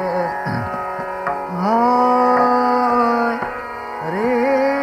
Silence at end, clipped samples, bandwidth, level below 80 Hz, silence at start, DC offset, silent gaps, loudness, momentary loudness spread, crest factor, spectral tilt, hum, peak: 0 s; under 0.1%; 15 kHz; -52 dBFS; 0 s; under 0.1%; none; -18 LUFS; 10 LU; 14 dB; -7 dB/octave; none; -4 dBFS